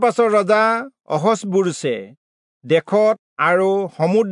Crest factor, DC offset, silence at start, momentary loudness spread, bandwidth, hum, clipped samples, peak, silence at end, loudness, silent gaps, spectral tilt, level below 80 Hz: 14 dB; under 0.1%; 0 s; 9 LU; 11 kHz; none; under 0.1%; -4 dBFS; 0 s; -18 LUFS; 2.17-2.61 s, 3.19-3.37 s; -5.5 dB/octave; -76 dBFS